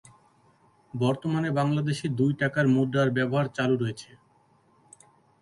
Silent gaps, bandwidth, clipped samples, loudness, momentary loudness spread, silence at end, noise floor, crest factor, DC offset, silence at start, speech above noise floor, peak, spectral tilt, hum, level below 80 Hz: none; 11.5 kHz; under 0.1%; -26 LUFS; 6 LU; 1.4 s; -63 dBFS; 16 dB; under 0.1%; 0.95 s; 38 dB; -12 dBFS; -7 dB/octave; none; -64 dBFS